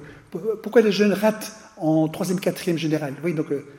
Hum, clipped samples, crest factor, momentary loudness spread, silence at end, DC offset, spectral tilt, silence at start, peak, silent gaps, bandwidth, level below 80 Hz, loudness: none; under 0.1%; 18 dB; 11 LU; 0 s; under 0.1%; -6 dB/octave; 0 s; -4 dBFS; none; 17 kHz; -64 dBFS; -22 LUFS